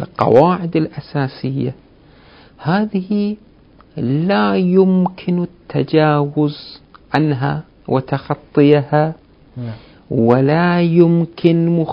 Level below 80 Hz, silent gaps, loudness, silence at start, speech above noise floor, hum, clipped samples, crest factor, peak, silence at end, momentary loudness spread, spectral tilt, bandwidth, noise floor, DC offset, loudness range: -50 dBFS; none; -16 LUFS; 0 s; 31 dB; none; under 0.1%; 16 dB; 0 dBFS; 0 s; 13 LU; -10 dB/octave; 5.4 kHz; -45 dBFS; under 0.1%; 6 LU